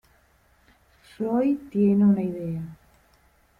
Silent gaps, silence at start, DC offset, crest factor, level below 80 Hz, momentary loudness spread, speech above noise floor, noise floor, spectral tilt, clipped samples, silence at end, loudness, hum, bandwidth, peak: none; 1.2 s; under 0.1%; 14 dB; -60 dBFS; 14 LU; 39 dB; -61 dBFS; -10.5 dB/octave; under 0.1%; 0.85 s; -24 LUFS; none; 4.4 kHz; -12 dBFS